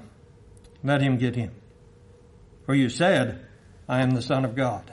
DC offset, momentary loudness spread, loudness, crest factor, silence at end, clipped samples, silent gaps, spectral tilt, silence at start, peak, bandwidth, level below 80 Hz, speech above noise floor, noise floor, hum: under 0.1%; 14 LU; -25 LUFS; 18 dB; 0 s; under 0.1%; none; -6.5 dB/octave; 0 s; -8 dBFS; 11.5 kHz; -56 dBFS; 28 dB; -52 dBFS; none